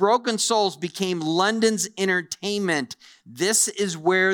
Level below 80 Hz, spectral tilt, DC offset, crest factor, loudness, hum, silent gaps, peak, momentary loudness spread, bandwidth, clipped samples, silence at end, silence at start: -68 dBFS; -3 dB/octave; under 0.1%; 16 dB; -22 LUFS; none; none; -6 dBFS; 7 LU; over 20 kHz; under 0.1%; 0 s; 0 s